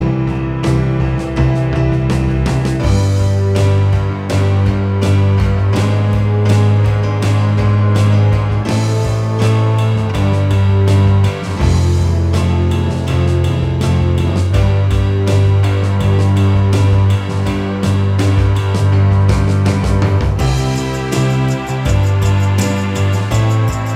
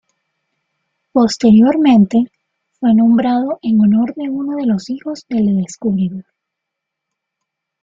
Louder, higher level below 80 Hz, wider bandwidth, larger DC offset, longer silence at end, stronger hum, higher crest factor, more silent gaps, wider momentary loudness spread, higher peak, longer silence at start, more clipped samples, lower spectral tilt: about the same, -14 LUFS vs -14 LUFS; first, -24 dBFS vs -54 dBFS; first, 11.5 kHz vs 7.6 kHz; neither; second, 0 s vs 1.6 s; neither; about the same, 12 dB vs 14 dB; neither; second, 4 LU vs 11 LU; about the same, 0 dBFS vs -2 dBFS; second, 0 s vs 1.15 s; neither; about the same, -7 dB/octave vs -7 dB/octave